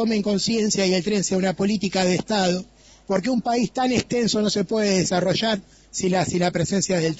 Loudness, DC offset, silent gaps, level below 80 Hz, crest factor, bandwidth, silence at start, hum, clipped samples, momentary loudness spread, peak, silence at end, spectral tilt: -22 LUFS; under 0.1%; none; -52 dBFS; 16 dB; 8 kHz; 0 s; none; under 0.1%; 4 LU; -4 dBFS; 0 s; -4.5 dB/octave